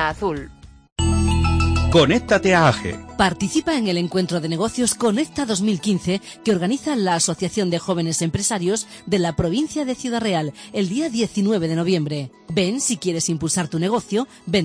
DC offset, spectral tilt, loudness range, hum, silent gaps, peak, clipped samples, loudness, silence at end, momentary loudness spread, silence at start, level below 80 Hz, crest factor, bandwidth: under 0.1%; -4.5 dB/octave; 4 LU; none; 0.92-0.96 s; -2 dBFS; under 0.1%; -20 LUFS; 0 s; 8 LU; 0 s; -34 dBFS; 18 dB; 10.5 kHz